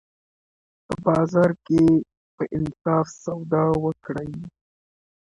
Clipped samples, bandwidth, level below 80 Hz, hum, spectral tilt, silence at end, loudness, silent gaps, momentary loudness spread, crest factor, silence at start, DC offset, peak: under 0.1%; 10.5 kHz; -52 dBFS; none; -8.5 dB/octave; 0.9 s; -22 LUFS; 2.17-2.38 s; 15 LU; 18 dB; 0.9 s; under 0.1%; -4 dBFS